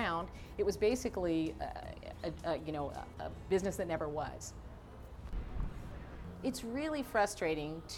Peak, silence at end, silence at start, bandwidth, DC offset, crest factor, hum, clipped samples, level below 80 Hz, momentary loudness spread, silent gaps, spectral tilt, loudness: -20 dBFS; 0 s; 0 s; 17.5 kHz; under 0.1%; 18 dB; none; under 0.1%; -50 dBFS; 15 LU; none; -5 dB/octave; -38 LUFS